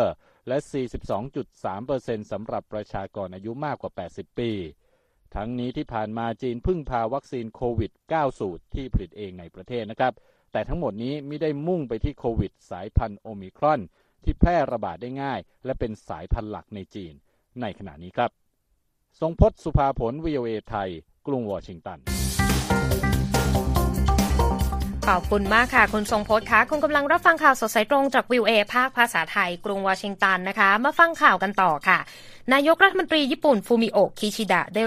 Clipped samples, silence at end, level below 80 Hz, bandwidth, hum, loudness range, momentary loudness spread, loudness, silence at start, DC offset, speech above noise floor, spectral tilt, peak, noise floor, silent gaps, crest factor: under 0.1%; 0 s; -34 dBFS; 15.5 kHz; none; 12 LU; 15 LU; -24 LUFS; 0 s; under 0.1%; 46 dB; -5 dB/octave; -2 dBFS; -70 dBFS; none; 22 dB